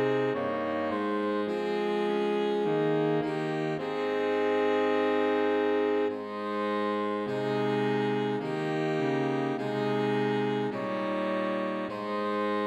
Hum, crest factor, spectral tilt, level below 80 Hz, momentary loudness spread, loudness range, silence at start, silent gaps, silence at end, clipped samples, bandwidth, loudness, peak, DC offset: none; 12 dB; -7 dB/octave; -76 dBFS; 5 LU; 2 LU; 0 s; none; 0 s; under 0.1%; 9.6 kHz; -29 LUFS; -16 dBFS; under 0.1%